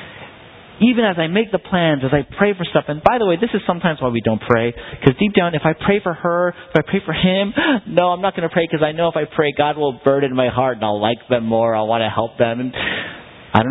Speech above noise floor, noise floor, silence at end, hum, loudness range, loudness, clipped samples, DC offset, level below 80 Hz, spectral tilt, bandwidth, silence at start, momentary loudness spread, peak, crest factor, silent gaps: 24 dB; -41 dBFS; 0 s; none; 1 LU; -18 LUFS; under 0.1%; under 0.1%; -46 dBFS; -9 dB/octave; 4.1 kHz; 0 s; 4 LU; 0 dBFS; 18 dB; none